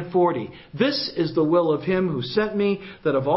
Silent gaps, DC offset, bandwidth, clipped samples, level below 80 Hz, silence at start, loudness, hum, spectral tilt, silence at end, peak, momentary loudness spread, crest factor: none; under 0.1%; 5.8 kHz; under 0.1%; -58 dBFS; 0 s; -23 LUFS; none; -10 dB/octave; 0 s; -6 dBFS; 5 LU; 16 dB